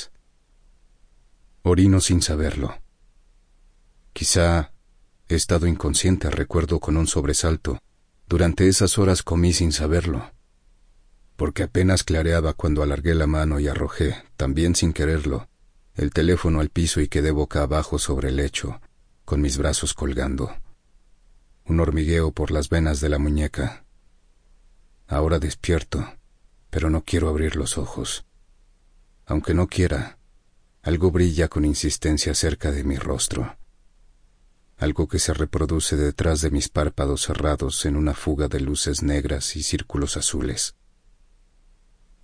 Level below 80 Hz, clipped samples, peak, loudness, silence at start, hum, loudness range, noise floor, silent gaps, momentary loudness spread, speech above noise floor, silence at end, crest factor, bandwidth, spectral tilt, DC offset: -30 dBFS; under 0.1%; -6 dBFS; -22 LUFS; 0 s; none; 5 LU; -57 dBFS; none; 9 LU; 36 dB; 1.5 s; 16 dB; 10.5 kHz; -5 dB/octave; under 0.1%